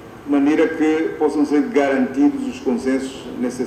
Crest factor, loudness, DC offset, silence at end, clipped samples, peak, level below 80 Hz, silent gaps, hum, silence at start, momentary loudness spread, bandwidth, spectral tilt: 14 dB; -19 LUFS; under 0.1%; 0 s; under 0.1%; -4 dBFS; -52 dBFS; none; none; 0 s; 7 LU; 10 kHz; -5.5 dB/octave